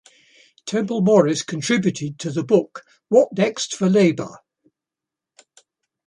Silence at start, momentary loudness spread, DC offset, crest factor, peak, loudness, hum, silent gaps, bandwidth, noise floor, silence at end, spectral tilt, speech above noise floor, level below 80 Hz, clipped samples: 0.65 s; 14 LU; under 0.1%; 20 dB; -2 dBFS; -19 LUFS; none; none; 11 kHz; -87 dBFS; 1.7 s; -5.5 dB/octave; 68 dB; -66 dBFS; under 0.1%